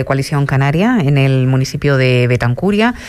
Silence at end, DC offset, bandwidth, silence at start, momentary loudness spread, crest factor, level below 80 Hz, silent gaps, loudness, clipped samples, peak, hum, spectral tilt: 0 s; under 0.1%; 13 kHz; 0 s; 3 LU; 10 dB; -38 dBFS; none; -13 LUFS; under 0.1%; -2 dBFS; none; -7 dB/octave